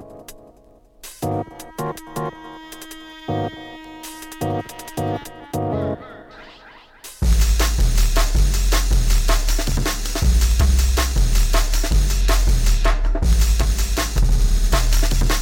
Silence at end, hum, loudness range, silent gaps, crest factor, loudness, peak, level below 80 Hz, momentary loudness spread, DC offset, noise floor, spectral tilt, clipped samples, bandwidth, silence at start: 0 s; none; 10 LU; none; 14 dB; -21 LUFS; -4 dBFS; -18 dBFS; 18 LU; under 0.1%; -50 dBFS; -4 dB/octave; under 0.1%; 17 kHz; 0 s